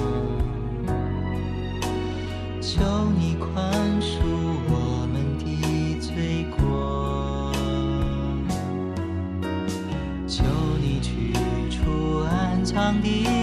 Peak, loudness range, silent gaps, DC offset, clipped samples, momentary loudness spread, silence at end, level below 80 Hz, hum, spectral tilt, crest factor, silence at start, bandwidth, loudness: -8 dBFS; 2 LU; none; under 0.1%; under 0.1%; 6 LU; 0 s; -32 dBFS; none; -6.5 dB/octave; 16 dB; 0 s; 13.5 kHz; -25 LUFS